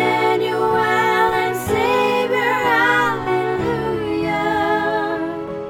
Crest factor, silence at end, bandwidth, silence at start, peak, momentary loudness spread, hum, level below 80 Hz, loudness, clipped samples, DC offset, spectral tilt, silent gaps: 14 dB; 0 s; 17.5 kHz; 0 s; -4 dBFS; 6 LU; none; -46 dBFS; -18 LUFS; under 0.1%; under 0.1%; -5 dB/octave; none